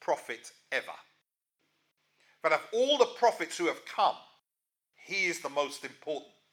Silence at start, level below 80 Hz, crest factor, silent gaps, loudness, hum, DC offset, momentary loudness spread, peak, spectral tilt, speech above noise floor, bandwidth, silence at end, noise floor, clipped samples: 0 s; under -90 dBFS; 24 dB; none; -31 LUFS; none; under 0.1%; 15 LU; -10 dBFS; -2 dB/octave; 58 dB; 17 kHz; 0.3 s; -89 dBFS; under 0.1%